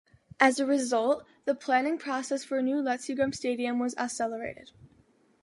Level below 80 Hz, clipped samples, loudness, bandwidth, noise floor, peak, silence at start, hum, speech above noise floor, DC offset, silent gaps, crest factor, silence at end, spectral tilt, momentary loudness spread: -68 dBFS; under 0.1%; -29 LUFS; 11.5 kHz; -64 dBFS; -6 dBFS; 0.4 s; none; 35 dB; under 0.1%; none; 22 dB; 0.55 s; -3.5 dB/octave; 8 LU